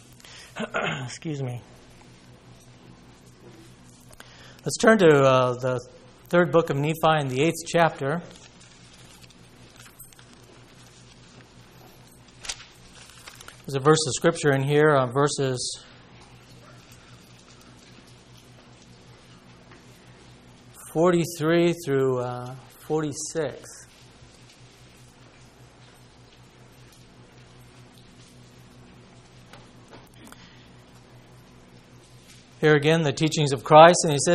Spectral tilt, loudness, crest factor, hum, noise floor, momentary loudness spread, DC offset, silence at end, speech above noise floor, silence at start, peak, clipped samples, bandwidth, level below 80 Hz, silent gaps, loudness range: -5 dB/octave; -22 LUFS; 26 dB; none; -51 dBFS; 27 LU; under 0.1%; 0 s; 30 dB; 0.3 s; 0 dBFS; under 0.1%; 14.5 kHz; -58 dBFS; none; 18 LU